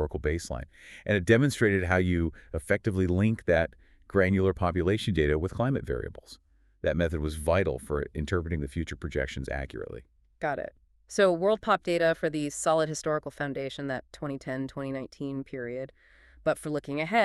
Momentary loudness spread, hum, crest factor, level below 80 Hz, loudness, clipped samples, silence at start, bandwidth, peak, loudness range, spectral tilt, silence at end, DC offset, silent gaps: 12 LU; none; 20 dB; -46 dBFS; -29 LUFS; under 0.1%; 0 s; 13 kHz; -8 dBFS; 8 LU; -6 dB/octave; 0 s; under 0.1%; none